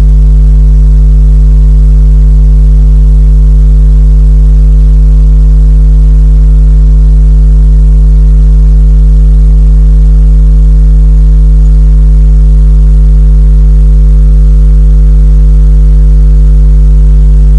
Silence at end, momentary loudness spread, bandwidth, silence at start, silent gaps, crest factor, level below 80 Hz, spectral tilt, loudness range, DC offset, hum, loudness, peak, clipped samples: 0 s; 0 LU; 1.4 kHz; 0 s; none; 2 dB; -2 dBFS; -9.5 dB/octave; 0 LU; under 0.1%; none; -6 LUFS; 0 dBFS; 0.4%